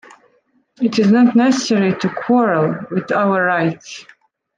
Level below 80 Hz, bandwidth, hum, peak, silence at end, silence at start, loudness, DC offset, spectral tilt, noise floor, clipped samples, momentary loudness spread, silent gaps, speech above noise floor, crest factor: -64 dBFS; 9.4 kHz; none; -4 dBFS; 0.55 s; 0.8 s; -16 LUFS; under 0.1%; -6 dB/octave; -60 dBFS; under 0.1%; 10 LU; none; 45 dB; 14 dB